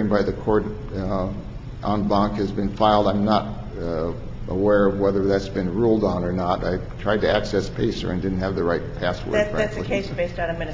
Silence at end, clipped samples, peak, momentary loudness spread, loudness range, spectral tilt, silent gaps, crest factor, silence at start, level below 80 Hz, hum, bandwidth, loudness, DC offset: 0 s; under 0.1%; -4 dBFS; 10 LU; 2 LU; -7 dB/octave; none; 18 dB; 0 s; -36 dBFS; none; 7.6 kHz; -23 LUFS; under 0.1%